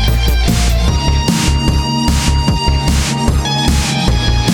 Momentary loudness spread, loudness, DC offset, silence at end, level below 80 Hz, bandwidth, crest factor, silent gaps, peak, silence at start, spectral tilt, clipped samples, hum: 1 LU; -14 LUFS; 0.3%; 0 s; -16 dBFS; 18.5 kHz; 12 dB; none; 0 dBFS; 0 s; -4.5 dB/octave; under 0.1%; none